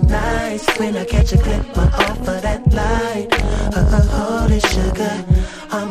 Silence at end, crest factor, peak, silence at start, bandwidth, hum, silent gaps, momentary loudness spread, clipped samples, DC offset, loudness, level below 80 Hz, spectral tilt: 0 s; 16 dB; 0 dBFS; 0 s; 15 kHz; none; none; 5 LU; under 0.1%; under 0.1%; -17 LUFS; -18 dBFS; -6 dB/octave